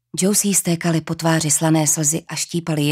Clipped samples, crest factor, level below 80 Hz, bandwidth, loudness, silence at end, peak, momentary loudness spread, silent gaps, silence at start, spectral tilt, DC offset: under 0.1%; 16 dB; -58 dBFS; 16 kHz; -18 LUFS; 0 s; -4 dBFS; 7 LU; none; 0.15 s; -4 dB/octave; under 0.1%